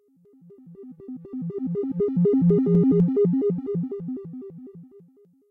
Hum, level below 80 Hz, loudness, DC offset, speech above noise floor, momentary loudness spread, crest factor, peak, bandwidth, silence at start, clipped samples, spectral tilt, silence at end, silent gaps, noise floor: none; -60 dBFS; -23 LUFS; under 0.1%; 33 dB; 22 LU; 14 dB; -10 dBFS; 2.2 kHz; 0.5 s; under 0.1%; -13.5 dB/octave; 0.65 s; none; -56 dBFS